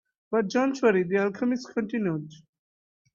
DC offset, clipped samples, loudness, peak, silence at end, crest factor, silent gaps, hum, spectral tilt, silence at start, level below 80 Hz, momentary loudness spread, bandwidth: under 0.1%; under 0.1%; -26 LUFS; -10 dBFS; 0.8 s; 18 dB; none; none; -6.5 dB/octave; 0.3 s; -72 dBFS; 8 LU; 7.4 kHz